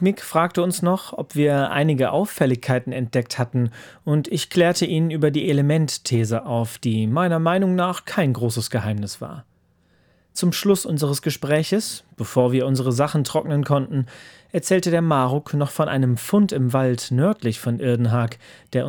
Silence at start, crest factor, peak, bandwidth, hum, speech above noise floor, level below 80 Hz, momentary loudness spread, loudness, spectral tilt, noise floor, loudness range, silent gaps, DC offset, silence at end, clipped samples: 0 s; 18 dB; -4 dBFS; over 20 kHz; none; 40 dB; -64 dBFS; 8 LU; -21 LUFS; -6 dB/octave; -61 dBFS; 3 LU; none; under 0.1%; 0 s; under 0.1%